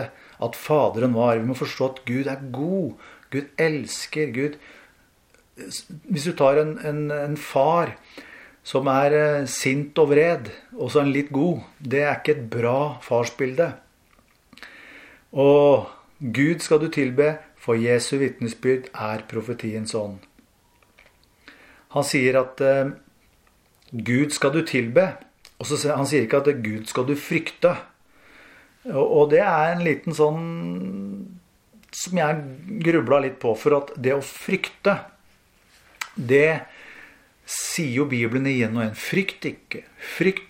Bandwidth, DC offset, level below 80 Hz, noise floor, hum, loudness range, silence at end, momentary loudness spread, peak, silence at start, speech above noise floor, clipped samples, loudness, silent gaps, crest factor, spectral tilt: 16 kHz; under 0.1%; -64 dBFS; -60 dBFS; none; 5 LU; 0.05 s; 15 LU; -4 dBFS; 0 s; 38 dB; under 0.1%; -22 LUFS; none; 20 dB; -5.5 dB/octave